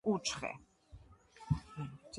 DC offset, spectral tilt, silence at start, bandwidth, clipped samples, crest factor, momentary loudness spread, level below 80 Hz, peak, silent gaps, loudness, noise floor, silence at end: under 0.1%; -5 dB/octave; 0.05 s; 11.5 kHz; under 0.1%; 20 dB; 24 LU; -56 dBFS; -20 dBFS; none; -39 LUFS; -59 dBFS; 0 s